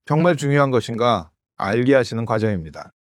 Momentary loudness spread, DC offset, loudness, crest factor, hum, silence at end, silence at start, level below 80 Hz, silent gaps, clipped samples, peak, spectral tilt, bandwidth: 9 LU; under 0.1%; -19 LUFS; 18 dB; none; 0.2 s; 0.1 s; -52 dBFS; none; under 0.1%; -2 dBFS; -6.5 dB/octave; 12.5 kHz